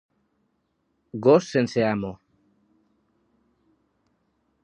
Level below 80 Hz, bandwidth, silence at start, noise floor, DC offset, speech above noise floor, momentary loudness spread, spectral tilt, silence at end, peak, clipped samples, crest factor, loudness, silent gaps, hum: -64 dBFS; 10 kHz; 1.15 s; -73 dBFS; under 0.1%; 52 dB; 16 LU; -6.5 dB/octave; 2.5 s; -4 dBFS; under 0.1%; 22 dB; -22 LUFS; none; none